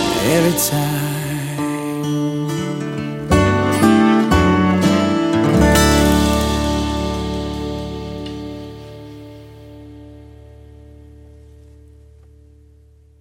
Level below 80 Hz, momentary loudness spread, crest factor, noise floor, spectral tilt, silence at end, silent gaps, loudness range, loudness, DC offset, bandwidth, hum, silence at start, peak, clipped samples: -30 dBFS; 20 LU; 18 dB; -48 dBFS; -5 dB/octave; 2.35 s; none; 17 LU; -17 LUFS; under 0.1%; 17 kHz; none; 0 s; -2 dBFS; under 0.1%